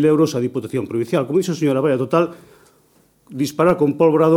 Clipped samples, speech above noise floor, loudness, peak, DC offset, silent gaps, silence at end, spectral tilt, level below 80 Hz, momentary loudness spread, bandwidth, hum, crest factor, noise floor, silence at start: under 0.1%; 40 dB; -18 LUFS; -2 dBFS; under 0.1%; none; 0 s; -7 dB/octave; -60 dBFS; 9 LU; 16.5 kHz; none; 16 dB; -57 dBFS; 0 s